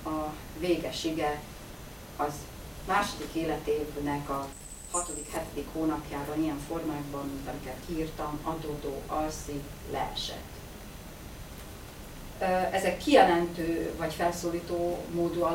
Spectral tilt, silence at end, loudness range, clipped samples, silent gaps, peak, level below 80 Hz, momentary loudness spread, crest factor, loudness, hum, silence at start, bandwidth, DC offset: -4.5 dB/octave; 0 s; 8 LU; under 0.1%; none; -8 dBFS; -48 dBFS; 16 LU; 24 dB; -31 LUFS; none; 0 s; 16.5 kHz; under 0.1%